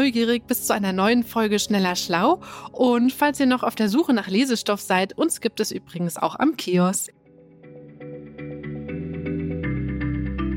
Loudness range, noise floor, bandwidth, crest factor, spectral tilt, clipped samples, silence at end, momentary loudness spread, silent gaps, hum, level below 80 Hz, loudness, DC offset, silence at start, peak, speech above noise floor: 7 LU; -49 dBFS; 17 kHz; 16 dB; -4.5 dB/octave; under 0.1%; 0 s; 13 LU; none; none; -42 dBFS; -22 LUFS; under 0.1%; 0 s; -6 dBFS; 28 dB